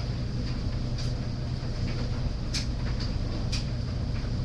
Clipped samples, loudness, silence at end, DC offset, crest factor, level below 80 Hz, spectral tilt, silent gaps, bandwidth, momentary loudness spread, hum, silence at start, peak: under 0.1%; -32 LUFS; 0 s; under 0.1%; 14 dB; -34 dBFS; -6 dB/octave; none; 10.5 kHz; 2 LU; none; 0 s; -16 dBFS